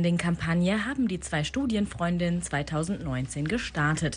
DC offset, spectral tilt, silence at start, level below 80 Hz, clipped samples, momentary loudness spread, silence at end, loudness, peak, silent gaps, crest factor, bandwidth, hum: under 0.1%; -5.5 dB/octave; 0 s; -46 dBFS; under 0.1%; 4 LU; 0 s; -28 LUFS; -14 dBFS; none; 14 dB; 10.5 kHz; none